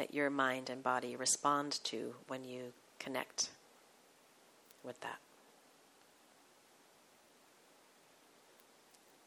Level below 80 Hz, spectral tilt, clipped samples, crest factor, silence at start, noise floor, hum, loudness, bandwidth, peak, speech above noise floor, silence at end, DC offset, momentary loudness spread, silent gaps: under -90 dBFS; -2 dB/octave; under 0.1%; 24 dB; 0 s; -67 dBFS; none; -38 LUFS; 17.5 kHz; -20 dBFS; 27 dB; 4.1 s; under 0.1%; 18 LU; none